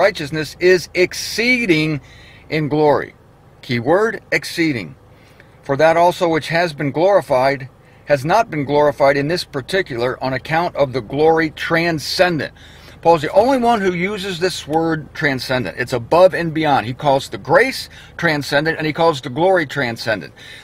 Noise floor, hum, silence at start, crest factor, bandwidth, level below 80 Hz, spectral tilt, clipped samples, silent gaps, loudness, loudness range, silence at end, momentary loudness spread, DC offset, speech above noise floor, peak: -45 dBFS; none; 0 s; 16 dB; 16 kHz; -48 dBFS; -5 dB/octave; under 0.1%; none; -17 LUFS; 2 LU; 0 s; 9 LU; under 0.1%; 28 dB; 0 dBFS